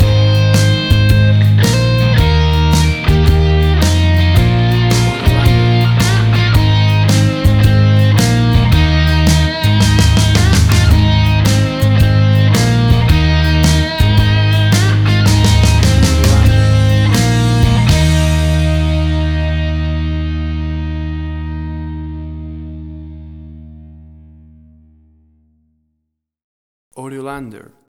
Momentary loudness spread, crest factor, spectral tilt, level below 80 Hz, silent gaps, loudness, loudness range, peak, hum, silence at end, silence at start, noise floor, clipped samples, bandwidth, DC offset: 13 LU; 10 dB; -5.5 dB/octave; -18 dBFS; 26.44-26.91 s; -11 LUFS; 11 LU; 0 dBFS; none; 0.4 s; 0 s; -72 dBFS; under 0.1%; 17.5 kHz; under 0.1%